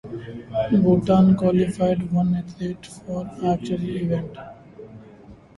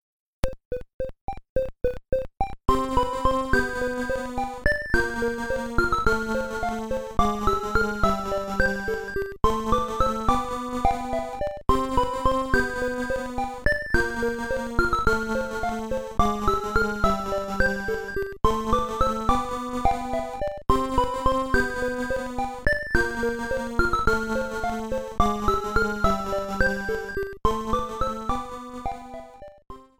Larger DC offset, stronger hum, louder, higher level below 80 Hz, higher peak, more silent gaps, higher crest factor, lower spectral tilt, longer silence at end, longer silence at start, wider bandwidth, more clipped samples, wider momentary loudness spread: neither; neither; first, -22 LUFS vs -26 LUFS; second, -48 dBFS vs -34 dBFS; about the same, -6 dBFS vs -4 dBFS; second, none vs 0.65-0.71 s, 0.94-0.99 s, 1.21-1.28 s, 1.49-1.56 s; about the same, 16 dB vs 20 dB; first, -8.5 dB/octave vs -5.5 dB/octave; about the same, 0.2 s vs 0.15 s; second, 0.05 s vs 0.45 s; second, 11.5 kHz vs 17.5 kHz; neither; first, 19 LU vs 7 LU